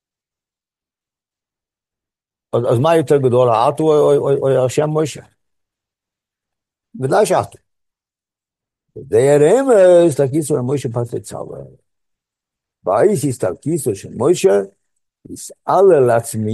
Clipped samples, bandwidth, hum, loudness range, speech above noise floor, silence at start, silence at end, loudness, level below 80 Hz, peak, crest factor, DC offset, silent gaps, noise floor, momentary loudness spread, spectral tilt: under 0.1%; 12.5 kHz; none; 7 LU; 76 dB; 2.55 s; 0 s; -15 LUFS; -58 dBFS; -2 dBFS; 16 dB; under 0.1%; none; -90 dBFS; 16 LU; -6.5 dB/octave